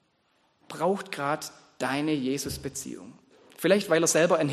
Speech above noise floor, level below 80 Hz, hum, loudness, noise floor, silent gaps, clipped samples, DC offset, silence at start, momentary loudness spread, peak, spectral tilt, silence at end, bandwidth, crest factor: 42 dB; -58 dBFS; none; -27 LUFS; -69 dBFS; none; under 0.1%; under 0.1%; 0.7 s; 17 LU; -8 dBFS; -4 dB/octave; 0 s; 13 kHz; 20 dB